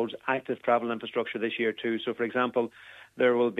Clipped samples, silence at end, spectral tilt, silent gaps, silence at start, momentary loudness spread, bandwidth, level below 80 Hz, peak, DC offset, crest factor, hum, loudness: under 0.1%; 0 s; -6.5 dB/octave; none; 0 s; 5 LU; 4 kHz; -78 dBFS; -10 dBFS; under 0.1%; 18 dB; none; -29 LUFS